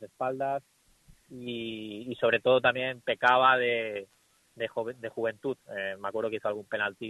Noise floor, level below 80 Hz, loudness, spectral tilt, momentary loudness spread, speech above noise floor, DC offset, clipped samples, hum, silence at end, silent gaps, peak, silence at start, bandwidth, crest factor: -60 dBFS; -70 dBFS; -29 LUFS; -5.5 dB/octave; 14 LU; 31 dB; under 0.1%; under 0.1%; none; 0 s; none; -8 dBFS; 0 s; 12 kHz; 22 dB